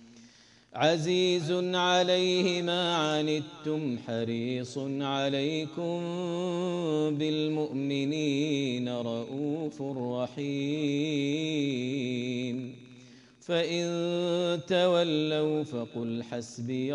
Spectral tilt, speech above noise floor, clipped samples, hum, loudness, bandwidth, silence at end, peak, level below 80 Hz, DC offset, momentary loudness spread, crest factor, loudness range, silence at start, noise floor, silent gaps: -5.5 dB/octave; 28 dB; under 0.1%; none; -30 LUFS; 10.5 kHz; 0 s; -12 dBFS; -76 dBFS; under 0.1%; 9 LU; 18 dB; 5 LU; 0 s; -57 dBFS; none